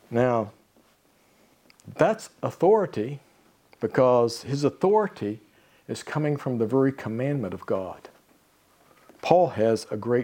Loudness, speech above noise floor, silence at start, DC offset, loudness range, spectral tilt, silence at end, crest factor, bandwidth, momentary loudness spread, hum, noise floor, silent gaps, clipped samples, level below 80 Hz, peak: -25 LUFS; 38 dB; 0.1 s; under 0.1%; 4 LU; -7 dB/octave; 0 s; 22 dB; 17 kHz; 15 LU; none; -62 dBFS; none; under 0.1%; -68 dBFS; -4 dBFS